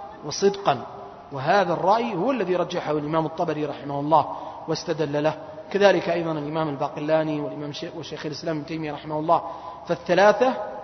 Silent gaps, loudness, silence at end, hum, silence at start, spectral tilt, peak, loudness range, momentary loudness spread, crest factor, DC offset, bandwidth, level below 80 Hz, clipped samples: none; -24 LUFS; 0 s; none; 0 s; -5.5 dB/octave; -4 dBFS; 4 LU; 13 LU; 20 dB; under 0.1%; 6.4 kHz; -60 dBFS; under 0.1%